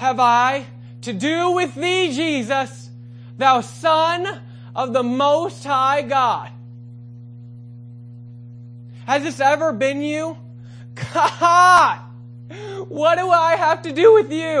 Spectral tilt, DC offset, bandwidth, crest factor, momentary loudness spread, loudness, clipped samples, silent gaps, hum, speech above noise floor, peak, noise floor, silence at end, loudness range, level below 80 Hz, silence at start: -4.5 dB/octave; under 0.1%; 11 kHz; 18 dB; 25 LU; -17 LUFS; under 0.1%; none; 60 Hz at -35 dBFS; 20 dB; 0 dBFS; -38 dBFS; 0 s; 7 LU; -64 dBFS; 0 s